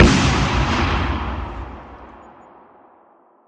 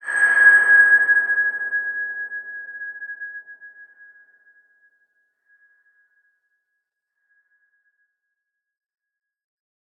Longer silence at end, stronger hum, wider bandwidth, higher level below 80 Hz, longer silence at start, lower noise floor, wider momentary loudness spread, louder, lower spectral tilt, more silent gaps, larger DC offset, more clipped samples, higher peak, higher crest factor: second, 1.3 s vs 6.15 s; neither; first, 10 kHz vs 8.8 kHz; first, -28 dBFS vs under -90 dBFS; about the same, 0 s vs 0.05 s; second, -53 dBFS vs -81 dBFS; about the same, 23 LU vs 22 LU; second, -19 LUFS vs -15 LUFS; first, -5 dB/octave vs 0 dB/octave; neither; neither; neither; first, 0 dBFS vs -4 dBFS; about the same, 20 dB vs 20 dB